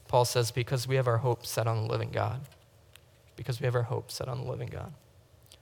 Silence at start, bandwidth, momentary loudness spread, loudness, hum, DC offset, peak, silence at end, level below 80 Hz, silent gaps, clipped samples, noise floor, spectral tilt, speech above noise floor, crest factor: 0.1 s; 19 kHz; 14 LU; -31 LUFS; none; under 0.1%; -12 dBFS; 0.65 s; -62 dBFS; none; under 0.1%; -58 dBFS; -5 dB/octave; 28 dB; 20 dB